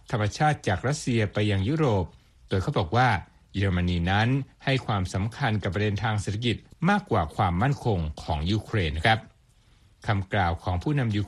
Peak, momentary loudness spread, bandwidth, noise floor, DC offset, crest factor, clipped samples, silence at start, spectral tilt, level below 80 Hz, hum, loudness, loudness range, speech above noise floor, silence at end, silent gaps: -6 dBFS; 6 LU; 11.5 kHz; -59 dBFS; under 0.1%; 20 dB; under 0.1%; 0.1 s; -6 dB/octave; -44 dBFS; none; -26 LUFS; 2 LU; 34 dB; 0 s; none